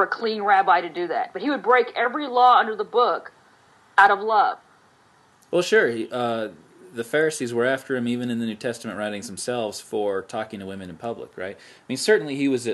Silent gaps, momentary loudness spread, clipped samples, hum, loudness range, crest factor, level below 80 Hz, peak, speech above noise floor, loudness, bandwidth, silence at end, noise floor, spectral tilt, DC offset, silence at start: none; 16 LU; under 0.1%; none; 8 LU; 22 dB; -74 dBFS; 0 dBFS; 35 dB; -22 LUFS; 12.5 kHz; 0 s; -57 dBFS; -4 dB/octave; under 0.1%; 0 s